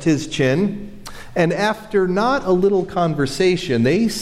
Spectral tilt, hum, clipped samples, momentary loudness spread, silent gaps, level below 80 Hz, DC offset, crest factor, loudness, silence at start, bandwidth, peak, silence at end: -6 dB/octave; none; under 0.1%; 8 LU; none; -42 dBFS; under 0.1%; 12 dB; -18 LUFS; 0 s; 15 kHz; -6 dBFS; 0 s